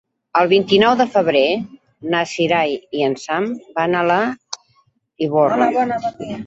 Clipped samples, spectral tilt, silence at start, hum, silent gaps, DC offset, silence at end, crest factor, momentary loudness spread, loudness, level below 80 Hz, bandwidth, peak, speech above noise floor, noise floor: under 0.1%; -5 dB/octave; 0.35 s; none; none; under 0.1%; 0 s; 16 dB; 11 LU; -17 LUFS; -58 dBFS; 8 kHz; -2 dBFS; 43 dB; -60 dBFS